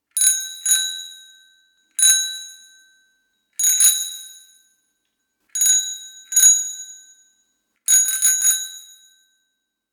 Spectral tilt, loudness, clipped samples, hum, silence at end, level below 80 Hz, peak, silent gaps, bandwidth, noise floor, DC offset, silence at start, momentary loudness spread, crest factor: 7 dB/octave; -15 LUFS; under 0.1%; none; 1.1 s; -72 dBFS; 0 dBFS; none; 19 kHz; -75 dBFS; under 0.1%; 0.15 s; 20 LU; 22 dB